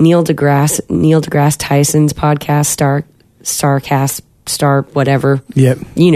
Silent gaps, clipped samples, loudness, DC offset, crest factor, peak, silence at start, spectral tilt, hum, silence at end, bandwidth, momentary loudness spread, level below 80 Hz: none; under 0.1%; -13 LUFS; under 0.1%; 12 dB; 0 dBFS; 0 s; -5.5 dB/octave; none; 0 s; 14 kHz; 5 LU; -42 dBFS